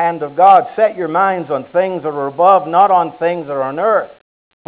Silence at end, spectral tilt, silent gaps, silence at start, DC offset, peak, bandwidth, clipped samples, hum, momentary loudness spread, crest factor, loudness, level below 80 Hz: 0.6 s; -9.5 dB/octave; none; 0 s; under 0.1%; 0 dBFS; 4 kHz; under 0.1%; none; 11 LU; 14 dB; -14 LUFS; -64 dBFS